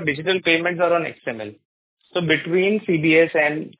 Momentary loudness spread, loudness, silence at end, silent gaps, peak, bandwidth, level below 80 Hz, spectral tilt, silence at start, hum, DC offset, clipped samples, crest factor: 14 LU; -19 LUFS; 0.1 s; 1.65-1.97 s; -4 dBFS; 4 kHz; -62 dBFS; -9 dB/octave; 0 s; none; under 0.1%; under 0.1%; 16 dB